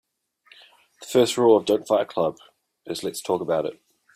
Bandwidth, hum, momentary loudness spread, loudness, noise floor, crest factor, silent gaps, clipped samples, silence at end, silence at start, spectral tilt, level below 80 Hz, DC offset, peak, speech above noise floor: 16 kHz; none; 14 LU; -23 LUFS; -58 dBFS; 20 dB; none; under 0.1%; 0.45 s; 1 s; -4.5 dB/octave; -68 dBFS; under 0.1%; -4 dBFS; 36 dB